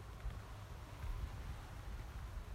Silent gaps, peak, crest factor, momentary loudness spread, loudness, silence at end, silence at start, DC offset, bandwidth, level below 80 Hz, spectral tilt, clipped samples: none; -32 dBFS; 14 dB; 5 LU; -50 LUFS; 0 s; 0 s; under 0.1%; 16 kHz; -48 dBFS; -5.5 dB/octave; under 0.1%